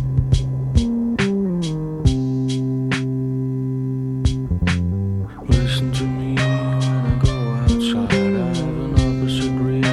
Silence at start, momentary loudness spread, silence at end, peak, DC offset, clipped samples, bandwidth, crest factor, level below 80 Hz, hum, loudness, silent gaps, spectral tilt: 0 s; 5 LU; 0 s; -2 dBFS; under 0.1%; under 0.1%; 11.5 kHz; 16 dB; -28 dBFS; none; -20 LUFS; none; -7 dB/octave